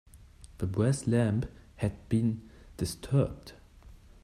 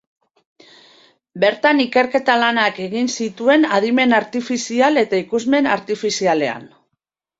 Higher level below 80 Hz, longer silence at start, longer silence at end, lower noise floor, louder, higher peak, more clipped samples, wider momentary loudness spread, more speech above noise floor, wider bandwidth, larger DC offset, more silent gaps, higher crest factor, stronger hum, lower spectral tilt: first, -50 dBFS vs -64 dBFS; second, 0.15 s vs 1.35 s; second, 0.3 s vs 0.7 s; second, -53 dBFS vs -77 dBFS; second, -31 LUFS vs -17 LUFS; second, -14 dBFS vs -2 dBFS; neither; first, 14 LU vs 7 LU; second, 24 dB vs 60 dB; first, 13.5 kHz vs 7.8 kHz; neither; neither; about the same, 18 dB vs 16 dB; neither; first, -7 dB/octave vs -3.5 dB/octave